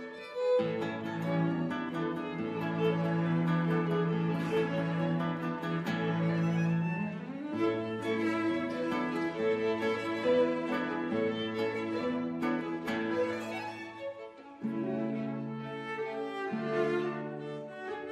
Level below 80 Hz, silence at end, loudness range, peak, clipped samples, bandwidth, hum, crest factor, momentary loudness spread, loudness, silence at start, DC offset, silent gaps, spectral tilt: -72 dBFS; 0 s; 4 LU; -18 dBFS; under 0.1%; 10 kHz; none; 14 dB; 9 LU; -33 LUFS; 0 s; under 0.1%; none; -7.5 dB/octave